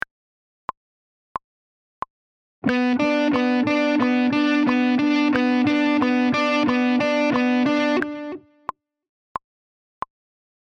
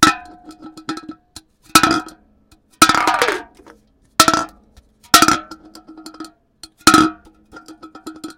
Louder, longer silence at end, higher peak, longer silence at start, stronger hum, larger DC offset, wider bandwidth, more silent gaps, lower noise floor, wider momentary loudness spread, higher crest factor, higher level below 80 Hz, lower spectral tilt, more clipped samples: second, -20 LUFS vs -14 LUFS; first, 2.35 s vs 0.05 s; second, -6 dBFS vs 0 dBFS; first, 2.65 s vs 0 s; neither; neither; second, 7.2 kHz vs over 20 kHz; neither; first, under -90 dBFS vs -54 dBFS; second, 17 LU vs 24 LU; about the same, 16 dB vs 18 dB; second, -60 dBFS vs -46 dBFS; first, -5.5 dB/octave vs -2 dB/octave; second, under 0.1% vs 0.2%